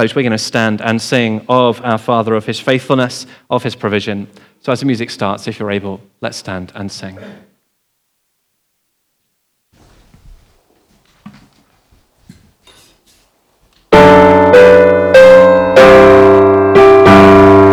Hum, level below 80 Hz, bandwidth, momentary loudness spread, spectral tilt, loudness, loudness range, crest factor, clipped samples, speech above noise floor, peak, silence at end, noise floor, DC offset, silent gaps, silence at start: none; -40 dBFS; 12.5 kHz; 20 LU; -6 dB/octave; -8 LUFS; 20 LU; 10 dB; 2%; 49 dB; 0 dBFS; 0 s; -65 dBFS; under 0.1%; none; 0 s